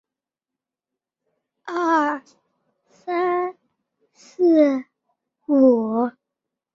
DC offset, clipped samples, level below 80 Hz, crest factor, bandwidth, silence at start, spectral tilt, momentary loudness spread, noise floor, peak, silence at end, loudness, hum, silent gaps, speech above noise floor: under 0.1%; under 0.1%; -72 dBFS; 18 dB; 7.4 kHz; 1.65 s; -6.5 dB/octave; 16 LU; -88 dBFS; -6 dBFS; 0.65 s; -20 LUFS; none; none; 70 dB